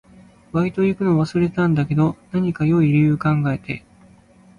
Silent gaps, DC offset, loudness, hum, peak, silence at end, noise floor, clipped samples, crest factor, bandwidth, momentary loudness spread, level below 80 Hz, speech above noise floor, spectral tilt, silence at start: none; under 0.1%; -19 LUFS; none; -8 dBFS; 0.8 s; -50 dBFS; under 0.1%; 12 dB; 9.8 kHz; 9 LU; -50 dBFS; 31 dB; -9 dB/octave; 0.55 s